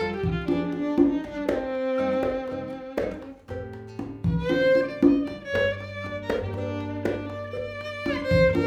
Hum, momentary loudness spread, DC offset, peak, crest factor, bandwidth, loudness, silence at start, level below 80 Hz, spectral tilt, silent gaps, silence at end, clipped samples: none; 13 LU; under 0.1%; -6 dBFS; 20 dB; 9.2 kHz; -26 LUFS; 0 s; -44 dBFS; -7.5 dB/octave; none; 0 s; under 0.1%